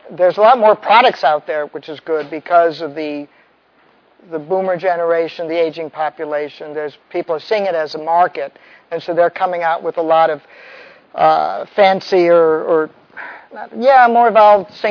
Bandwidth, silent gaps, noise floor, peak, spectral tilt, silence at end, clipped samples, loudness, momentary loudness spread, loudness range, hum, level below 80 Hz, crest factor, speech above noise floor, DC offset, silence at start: 5.4 kHz; none; -53 dBFS; 0 dBFS; -6 dB/octave; 0 s; under 0.1%; -14 LUFS; 17 LU; 7 LU; none; -70 dBFS; 16 dB; 39 dB; under 0.1%; 0.1 s